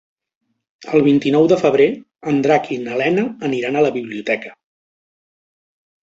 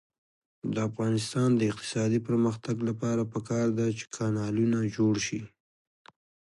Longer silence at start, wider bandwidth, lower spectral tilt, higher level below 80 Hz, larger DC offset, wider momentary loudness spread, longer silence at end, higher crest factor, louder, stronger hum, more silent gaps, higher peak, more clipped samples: first, 0.8 s vs 0.65 s; second, 7.8 kHz vs 11.5 kHz; about the same, -6.5 dB/octave vs -6 dB/octave; about the same, -60 dBFS vs -64 dBFS; neither; first, 9 LU vs 6 LU; first, 1.5 s vs 1.1 s; about the same, 16 dB vs 14 dB; first, -17 LUFS vs -29 LUFS; neither; neither; first, -2 dBFS vs -16 dBFS; neither